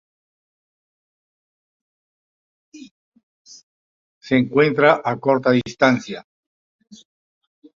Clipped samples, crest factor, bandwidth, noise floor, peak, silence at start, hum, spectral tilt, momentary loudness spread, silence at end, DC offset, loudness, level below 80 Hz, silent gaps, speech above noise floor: under 0.1%; 22 dB; 7.4 kHz; under -90 dBFS; -2 dBFS; 2.75 s; none; -6 dB/octave; 9 LU; 1.55 s; under 0.1%; -18 LUFS; -62 dBFS; 2.91-3.12 s, 3.23-3.45 s, 3.63-4.21 s; over 73 dB